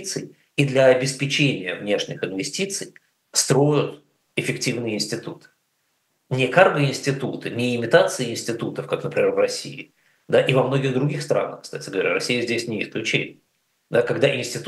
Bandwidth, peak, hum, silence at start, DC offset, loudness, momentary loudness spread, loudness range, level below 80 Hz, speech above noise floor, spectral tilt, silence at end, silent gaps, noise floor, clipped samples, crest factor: 12.5 kHz; 0 dBFS; none; 0 s; under 0.1%; -22 LUFS; 12 LU; 3 LU; -74 dBFS; 49 dB; -4.5 dB/octave; 0 s; none; -70 dBFS; under 0.1%; 22 dB